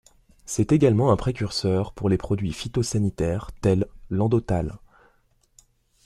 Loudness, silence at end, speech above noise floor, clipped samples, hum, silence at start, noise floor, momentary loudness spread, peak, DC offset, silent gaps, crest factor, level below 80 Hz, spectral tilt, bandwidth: -24 LUFS; 1.3 s; 41 dB; under 0.1%; none; 0.5 s; -63 dBFS; 8 LU; -6 dBFS; under 0.1%; none; 18 dB; -44 dBFS; -6.5 dB/octave; 13 kHz